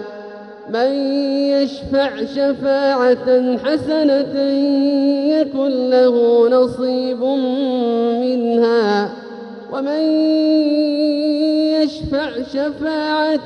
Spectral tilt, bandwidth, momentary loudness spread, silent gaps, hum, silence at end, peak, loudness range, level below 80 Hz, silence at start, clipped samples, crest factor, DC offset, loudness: -6.5 dB/octave; 9 kHz; 8 LU; none; none; 0 s; -2 dBFS; 2 LU; -50 dBFS; 0 s; under 0.1%; 14 dB; under 0.1%; -16 LUFS